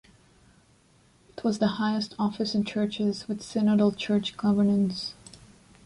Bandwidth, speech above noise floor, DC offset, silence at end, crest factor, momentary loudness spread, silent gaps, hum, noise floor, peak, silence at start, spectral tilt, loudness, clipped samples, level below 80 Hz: 11 kHz; 35 dB; under 0.1%; 0.5 s; 16 dB; 11 LU; none; none; -61 dBFS; -10 dBFS; 1.35 s; -6.5 dB/octave; -27 LUFS; under 0.1%; -62 dBFS